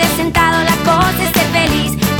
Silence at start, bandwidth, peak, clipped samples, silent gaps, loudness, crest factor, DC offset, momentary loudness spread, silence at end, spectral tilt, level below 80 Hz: 0 s; over 20 kHz; -2 dBFS; under 0.1%; none; -12 LUFS; 12 dB; under 0.1%; 2 LU; 0 s; -4 dB/octave; -30 dBFS